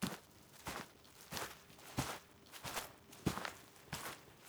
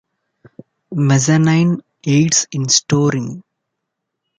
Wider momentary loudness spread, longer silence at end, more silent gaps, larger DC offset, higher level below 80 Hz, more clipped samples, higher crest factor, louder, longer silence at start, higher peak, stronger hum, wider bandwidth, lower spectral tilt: about the same, 13 LU vs 12 LU; second, 0 s vs 1 s; neither; neither; second, -64 dBFS vs -56 dBFS; neither; first, 28 dB vs 16 dB; second, -47 LUFS vs -15 LUFS; second, 0 s vs 0.9 s; second, -20 dBFS vs 0 dBFS; neither; first, over 20 kHz vs 9.6 kHz; about the same, -3.5 dB/octave vs -4.5 dB/octave